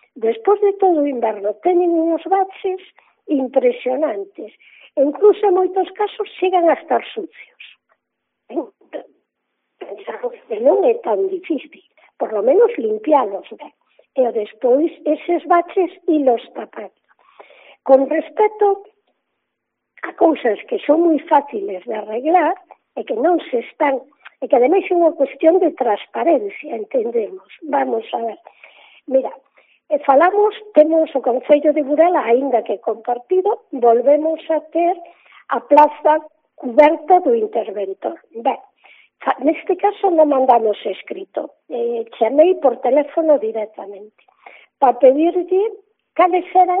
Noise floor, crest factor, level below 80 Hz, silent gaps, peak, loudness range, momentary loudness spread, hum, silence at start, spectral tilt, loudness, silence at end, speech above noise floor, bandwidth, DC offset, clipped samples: -77 dBFS; 18 dB; -72 dBFS; none; 0 dBFS; 5 LU; 15 LU; none; 0.15 s; -2.5 dB/octave; -17 LUFS; 0 s; 60 dB; 4.1 kHz; under 0.1%; under 0.1%